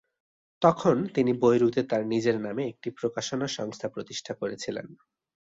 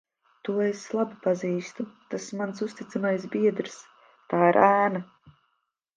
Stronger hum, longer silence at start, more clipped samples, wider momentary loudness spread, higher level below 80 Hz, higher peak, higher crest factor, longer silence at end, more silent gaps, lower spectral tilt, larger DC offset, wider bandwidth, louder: neither; first, 0.6 s vs 0.45 s; neither; second, 13 LU vs 17 LU; first, -66 dBFS vs -76 dBFS; about the same, -6 dBFS vs -6 dBFS; about the same, 22 dB vs 22 dB; about the same, 0.55 s vs 0.65 s; neither; about the same, -5.5 dB/octave vs -6 dB/octave; neither; second, 7.8 kHz vs 9.4 kHz; about the same, -27 LUFS vs -26 LUFS